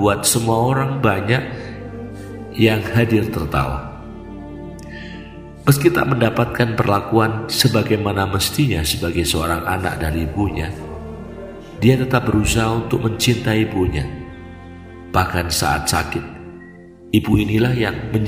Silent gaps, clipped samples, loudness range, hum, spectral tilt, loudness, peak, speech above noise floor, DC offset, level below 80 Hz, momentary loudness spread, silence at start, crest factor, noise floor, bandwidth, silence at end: none; under 0.1%; 4 LU; none; -5 dB/octave; -18 LUFS; 0 dBFS; 22 dB; 0.1%; -36 dBFS; 18 LU; 0 s; 18 dB; -40 dBFS; 16 kHz; 0 s